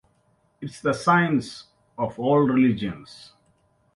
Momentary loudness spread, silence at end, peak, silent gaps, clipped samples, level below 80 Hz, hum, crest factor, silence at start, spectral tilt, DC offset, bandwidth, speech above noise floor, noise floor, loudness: 21 LU; 0.8 s; -6 dBFS; none; under 0.1%; -58 dBFS; none; 18 dB; 0.6 s; -7 dB/octave; under 0.1%; 11.5 kHz; 43 dB; -65 dBFS; -22 LUFS